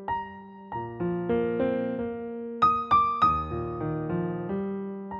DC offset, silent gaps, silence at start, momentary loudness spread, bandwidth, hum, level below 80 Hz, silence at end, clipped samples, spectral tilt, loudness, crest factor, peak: under 0.1%; none; 0 s; 13 LU; 7 kHz; none; -50 dBFS; 0 s; under 0.1%; -9 dB/octave; -27 LUFS; 18 dB; -10 dBFS